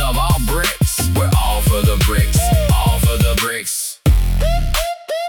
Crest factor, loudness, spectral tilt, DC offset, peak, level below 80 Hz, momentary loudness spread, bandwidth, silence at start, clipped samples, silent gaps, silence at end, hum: 12 dB; -16 LUFS; -4.5 dB/octave; under 0.1%; -4 dBFS; -18 dBFS; 4 LU; 18 kHz; 0 s; under 0.1%; none; 0 s; none